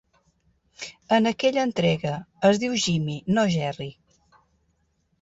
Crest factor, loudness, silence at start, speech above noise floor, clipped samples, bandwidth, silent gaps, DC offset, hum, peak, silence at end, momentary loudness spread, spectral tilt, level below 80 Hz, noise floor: 18 dB; -23 LUFS; 0.8 s; 47 dB; under 0.1%; 8 kHz; none; under 0.1%; none; -8 dBFS; 1.3 s; 16 LU; -5 dB/octave; -60 dBFS; -70 dBFS